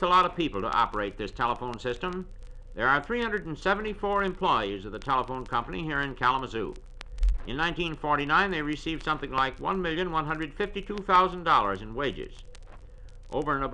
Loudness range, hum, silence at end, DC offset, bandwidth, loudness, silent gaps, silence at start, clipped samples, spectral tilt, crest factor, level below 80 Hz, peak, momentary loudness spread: 3 LU; none; 0 s; under 0.1%; 10 kHz; -28 LUFS; none; 0 s; under 0.1%; -5.5 dB/octave; 20 dB; -40 dBFS; -10 dBFS; 11 LU